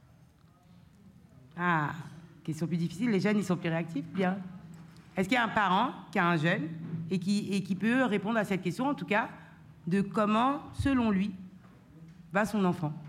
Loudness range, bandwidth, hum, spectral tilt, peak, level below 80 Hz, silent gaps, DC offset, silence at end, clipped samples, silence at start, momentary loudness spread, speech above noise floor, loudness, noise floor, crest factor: 3 LU; 14 kHz; none; -6.5 dB/octave; -14 dBFS; -58 dBFS; none; under 0.1%; 0 s; under 0.1%; 1.05 s; 16 LU; 30 dB; -30 LUFS; -60 dBFS; 16 dB